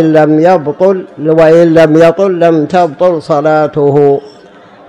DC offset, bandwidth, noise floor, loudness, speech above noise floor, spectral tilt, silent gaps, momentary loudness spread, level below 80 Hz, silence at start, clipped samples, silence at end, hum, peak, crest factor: under 0.1%; 10 kHz; -36 dBFS; -8 LUFS; 29 dB; -8 dB/octave; none; 6 LU; -50 dBFS; 0 s; 4%; 0.6 s; none; 0 dBFS; 8 dB